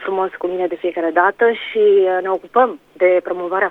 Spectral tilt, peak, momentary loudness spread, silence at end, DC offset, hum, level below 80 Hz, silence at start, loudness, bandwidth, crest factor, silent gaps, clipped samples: -6.5 dB/octave; 0 dBFS; 8 LU; 0 s; under 0.1%; none; -64 dBFS; 0 s; -17 LUFS; 4 kHz; 16 dB; none; under 0.1%